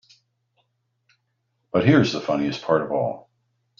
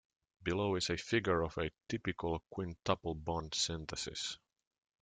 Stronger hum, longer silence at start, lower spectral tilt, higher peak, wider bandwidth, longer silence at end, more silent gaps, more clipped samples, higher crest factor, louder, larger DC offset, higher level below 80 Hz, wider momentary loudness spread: neither; first, 1.75 s vs 0.4 s; first, -5.5 dB/octave vs -4 dB/octave; first, -2 dBFS vs -16 dBFS; second, 7.4 kHz vs 9.6 kHz; about the same, 0.6 s vs 0.65 s; neither; neither; about the same, 22 dB vs 22 dB; first, -22 LUFS vs -37 LUFS; neither; about the same, -60 dBFS vs -58 dBFS; about the same, 9 LU vs 7 LU